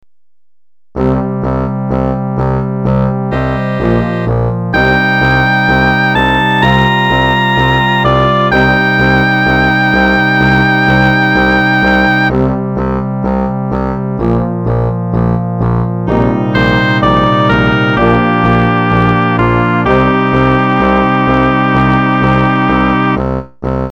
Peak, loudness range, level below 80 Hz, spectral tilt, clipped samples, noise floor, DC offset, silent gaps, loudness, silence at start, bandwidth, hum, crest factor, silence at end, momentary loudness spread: 0 dBFS; 5 LU; -26 dBFS; -7.5 dB/octave; under 0.1%; -84 dBFS; 1%; none; -11 LUFS; 0.95 s; 19 kHz; none; 10 dB; 0 s; 6 LU